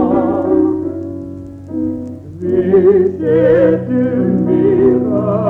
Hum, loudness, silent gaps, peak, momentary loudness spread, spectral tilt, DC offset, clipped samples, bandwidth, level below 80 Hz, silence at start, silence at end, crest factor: none; -13 LUFS; none; -2 dBFS; 15 LU; -11 dB/octave; under 0.1%; under 0.1%; 3.8 kHz; -44 dBFS; 0 s; 0 s; 12 dB